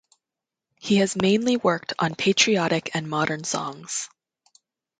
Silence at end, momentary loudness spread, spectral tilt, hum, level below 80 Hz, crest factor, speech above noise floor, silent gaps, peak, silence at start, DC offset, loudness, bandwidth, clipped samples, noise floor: 0.95 s; 11 LU; -4 dB/octave; none; -64 dBFS; 20 dB; 65 dB; none; -4 dBFS; 0.85 s; under 0.1%; -23 LUFS; 9.6 kHz; under 0.1%; -88 dBFS